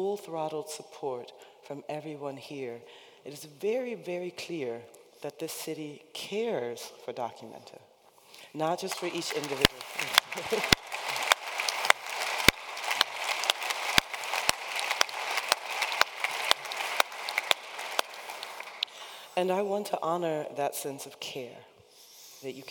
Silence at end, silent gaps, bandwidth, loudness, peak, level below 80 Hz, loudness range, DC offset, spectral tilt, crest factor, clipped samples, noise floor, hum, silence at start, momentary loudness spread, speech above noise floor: 0 s; none; 19 kHz; -30 LUFS; 0 dBFS; -56 dBFS; 11 LU; under 0.1%; -2 dB/octave; 32 dB; under 0.1%; -57 dBFS; none; 0 s; 16 LU; 23 dB